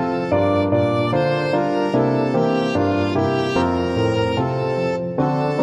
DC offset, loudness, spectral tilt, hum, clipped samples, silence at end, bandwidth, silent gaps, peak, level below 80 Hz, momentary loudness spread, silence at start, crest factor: under 0.1%; -19 LUFS; -7.5 dB/octave; none; under 0.1%; 0 s; 11 kHz; none; -6 dBFS; -46 dBFS; 3 LU; 0 s; 14 dB